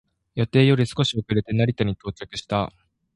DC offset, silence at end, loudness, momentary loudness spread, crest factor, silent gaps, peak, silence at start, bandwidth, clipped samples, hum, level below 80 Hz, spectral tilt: under 0.1%; 0.45 s; -23 LUFS; 14 LU; 20 dB; none; -4 dBFS; 0.35 s; 11.5 kHz; under 0.1%; none; -48 dBFS; -6.5 dB/octave